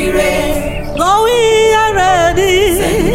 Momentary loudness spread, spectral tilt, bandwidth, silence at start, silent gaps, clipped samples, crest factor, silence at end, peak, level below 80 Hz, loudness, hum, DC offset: 6 LU; -4 dB/octave; 16.5 kHz; 0 s; none; under 0.1%; 10 dB; 0 s; 0 dBFS; -26 dBFS; -11 LUFS; none; under 0.1%